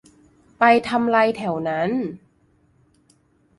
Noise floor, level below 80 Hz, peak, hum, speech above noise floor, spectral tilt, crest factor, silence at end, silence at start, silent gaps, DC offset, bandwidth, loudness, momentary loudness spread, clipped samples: -60 dBFS; -60 dBFS; 0 dBFS; none; 41 dB; -6.5 dB/octave; 22 dB; 1.4 s; 0.6 s; none; under 0.1%; 11.5 kHz; -20 LUFS; 9 LU; under 0.1%